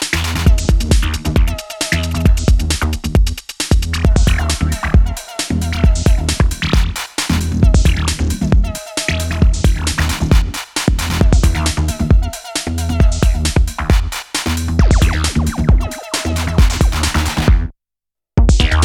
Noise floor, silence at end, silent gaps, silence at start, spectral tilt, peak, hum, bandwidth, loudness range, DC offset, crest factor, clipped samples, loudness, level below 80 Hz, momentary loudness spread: -81 dBFS; 0 s; none; 0 s; -5 dB/octave; 0 dBFS; none; 16 kHz; 1 LU; under 0.1%; 14 dB; under 0.1%; -16 LUFS; -16 dBFS; 6 LU